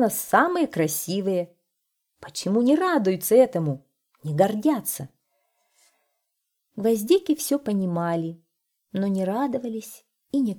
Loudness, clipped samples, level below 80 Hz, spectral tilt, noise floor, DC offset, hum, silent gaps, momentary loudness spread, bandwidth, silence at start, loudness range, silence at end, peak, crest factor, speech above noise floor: -23 LUFS; under 0.1%; -70 dBFS; -5.5 dB/octave; -79 dBFS; under 0.1%; none; none; 15 LU; 20 kHz; 0 s; 5 LU; 0 s; -4 dBFS; 20 dB; 56 dB